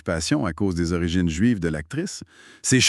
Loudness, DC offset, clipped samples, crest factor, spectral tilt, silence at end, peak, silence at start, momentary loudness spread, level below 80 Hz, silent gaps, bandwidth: -24 LUFS; under 0.1%; under 0.1%; 18 dB; -4 dB/octave; 0 s; -6 dBFS; 0.05 s; 8 LU; -42 dBFS; none; 13 kHz